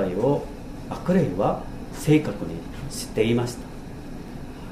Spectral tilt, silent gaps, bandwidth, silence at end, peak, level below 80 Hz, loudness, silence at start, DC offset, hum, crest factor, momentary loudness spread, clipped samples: -6.5 dB/octave; none; 15.5 kHz; 0 s; -8 dBFS; -40 dBFS; -25 LUFS; 0 s; under 0.1%; none; 18 dB; 17 LU; under 0.1%